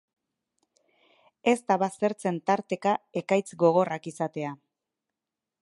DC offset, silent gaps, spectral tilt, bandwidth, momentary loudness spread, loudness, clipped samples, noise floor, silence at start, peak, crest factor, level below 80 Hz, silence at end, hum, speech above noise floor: under 0.1%; none; -6 dB/octave; 11.5 kHz; 9 LU; -27 LUFS; under 0.1%; -88 dBFS; 1.45 s; -8 dBFS; 20 dB; -80 dBFS; 1.1 s; none; 62 dB